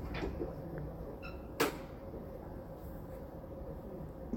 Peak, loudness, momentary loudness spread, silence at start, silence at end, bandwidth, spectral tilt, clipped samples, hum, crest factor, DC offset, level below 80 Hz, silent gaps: -18 dBFS; -43 LUFS; 12 LU; 0 s; 0 s; 17 kHz; -5.5 dB/octave; under 0.1%; none; 24 dB; under 0.1%; -50 dBFS; none